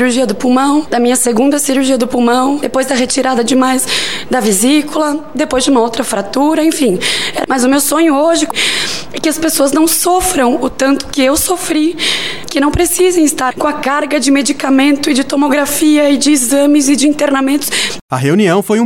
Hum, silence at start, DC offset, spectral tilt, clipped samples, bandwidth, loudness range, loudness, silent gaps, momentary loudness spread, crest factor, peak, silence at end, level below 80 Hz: none; 0 s; 3%; -3 dB/octave; under 0.1%; 17.5 kHz; 2 LU; -11 LUFS; 18.01-18.09 s; 5 LU; 10 dB; 0 dBFS; 0 s; -38 dBFS